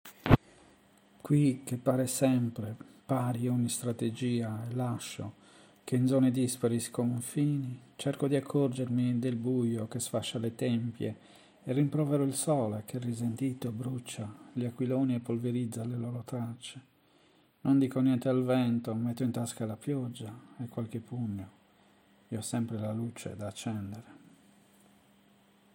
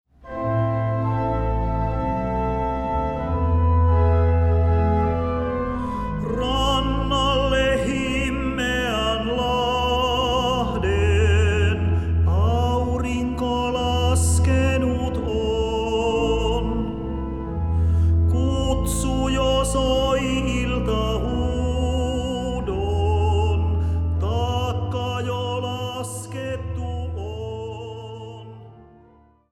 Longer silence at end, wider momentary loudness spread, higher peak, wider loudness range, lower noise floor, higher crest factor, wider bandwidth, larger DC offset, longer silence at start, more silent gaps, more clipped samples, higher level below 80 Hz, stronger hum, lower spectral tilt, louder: first, 1.6 s vs 0.7 s; first, 13 LU vs 10 LU; about the same, -8 dBFS vs -8 dBFS; first, 8 LU vs 5 LU; first, -65 dBFS vs -54 dBFS; first, 26 dB vs 14 dB; first, 17 kHz vs 12.5 kHz; neither; second, 0.05 s vs 0.25 s; neither; neither; second, -58 dBFS vs -28 dBFS; neither; about the same, -6.5 dB/octave vs -6 dB/octave; second, -32 LUFS vs -22 LUFS